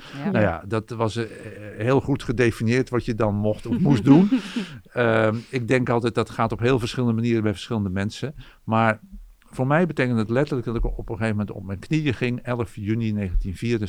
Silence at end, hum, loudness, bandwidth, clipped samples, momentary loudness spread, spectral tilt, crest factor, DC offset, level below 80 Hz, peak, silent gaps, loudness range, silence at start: 0 s; none; -23 LUFS; 13 kHz; under 0.1%; 10 LU; -7.5 dB/octave; 20 dB; under 0.1%; -38 dBFS; -2 dBFS; none; 4 LU; 0 s